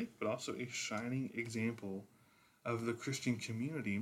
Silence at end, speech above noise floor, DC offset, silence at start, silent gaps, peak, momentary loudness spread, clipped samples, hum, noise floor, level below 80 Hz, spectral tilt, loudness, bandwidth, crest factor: 0 s; 29 dB; under 0.1%; 0 s; none; -24 dBFS; 6 LU; under 0.1%; none; -69 dBFS; -80 dBFS; -5 dB/octave; -41 LUFS; 16 kHz; 18 dB